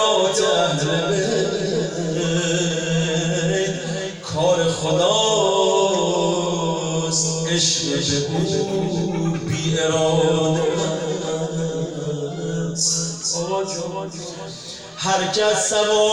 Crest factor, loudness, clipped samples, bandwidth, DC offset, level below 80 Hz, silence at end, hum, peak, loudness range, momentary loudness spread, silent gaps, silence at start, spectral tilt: 14 dB; -20 LUFS; under 0.1%; 11.5 kHz; under 0.1%; -52 dBFS; 0 s; none; -6 dBFS; 4 LU; 9 LU; none; 0 s; -4 dB/octave